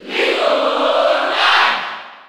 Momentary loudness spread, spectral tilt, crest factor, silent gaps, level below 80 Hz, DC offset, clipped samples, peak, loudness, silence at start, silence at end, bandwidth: 6 LU; -1.5 dB/octave; 14 dB; none; -70 dBFS; under 0.1%; under 0.1%; -2 dBFS; -14 LUFS; 0 s; 0.1 s; 15 kHz